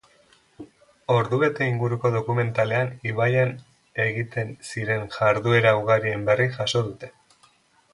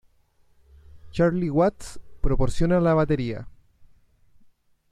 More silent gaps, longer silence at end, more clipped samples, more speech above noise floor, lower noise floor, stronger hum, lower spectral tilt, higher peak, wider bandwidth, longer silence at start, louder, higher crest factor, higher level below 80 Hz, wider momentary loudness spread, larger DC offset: neither; second, 0.85 s vs 1.45 s; neither; about the same, 37 dB vs 40 dB; about the same, -60 dBFS vs -61 dBFS; neither; second, -6 dB/octave vs -7.5 dB/octave; first, -4 dBFS vs -8 dBFS; about the same, 11.5 kHz vs 11 kHz; second, 0.6 s vs 0.95 s; about the same, -23 LUFS vs -24 LUFS; about the same, 20 dB vs 16 dB; second, -58 dBFS vs -34 dBFS; second, 12 LU vs 16 LU; neither